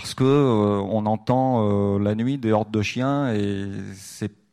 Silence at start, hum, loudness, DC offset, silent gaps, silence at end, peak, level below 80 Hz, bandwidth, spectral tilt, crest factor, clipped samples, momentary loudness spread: 0 s; none; -22 LUFS; under 0.1%; none; 0.25 s; -6 dBFS; -56 dBFS; 13.5 kHz; -7 dB/octave; 16 dB; under 0.1%; 14 LU